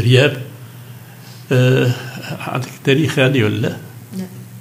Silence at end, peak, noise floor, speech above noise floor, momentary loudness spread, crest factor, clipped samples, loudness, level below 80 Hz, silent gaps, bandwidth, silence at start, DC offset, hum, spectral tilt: 0 s; 0 dBFS; -37 dBFS; 21 dB; 23 LU; 18 dB; under 0.1%; -16 LUFS; -68 dBFS; none; 16 kHz; 0 s; under 0.1%; none; -6 dB/octave